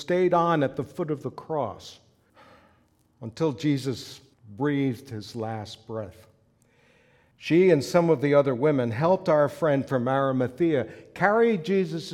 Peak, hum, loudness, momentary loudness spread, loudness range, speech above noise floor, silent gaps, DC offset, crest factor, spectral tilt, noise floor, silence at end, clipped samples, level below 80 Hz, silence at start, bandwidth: -6 dBFS; none; -24 LUFS; 16 LU; 10 LU; 39 dB; none; under 0.1%; 20 dB; -7 dB/octave; -64 dBFS; 0 s; under 0.1%; -66 dBFS; 0 s; 14.5 kHz